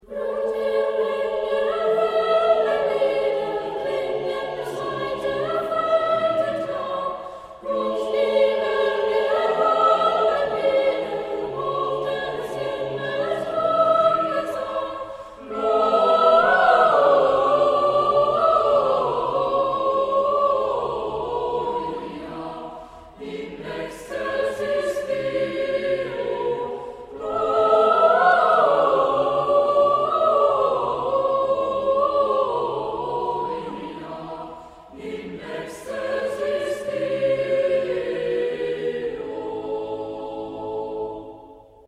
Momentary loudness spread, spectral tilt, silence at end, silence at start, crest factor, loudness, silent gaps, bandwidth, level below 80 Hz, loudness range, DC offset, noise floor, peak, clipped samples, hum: 16 LU; -5 dB/octave; 0.3 s; 0.1 s; 18 dB; -21 LUFS; none; 12 kHz; -56 dBFS; 10 LU; under 0.1%; -46 dBFS; -4 dBFS; under 0.1%; none